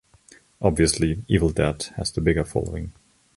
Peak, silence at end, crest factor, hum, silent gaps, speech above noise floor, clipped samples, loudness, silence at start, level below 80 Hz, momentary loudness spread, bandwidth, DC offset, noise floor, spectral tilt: -4 dBFS; 0.45 s; 20 dB; none; none; 31 dB; under 0.1%; -23 LUFS; 0.6 s; -36 dBFS; 10 LU; 11.5 kHz; under 0.1%; -54 dBFS; -5.5 dB/octave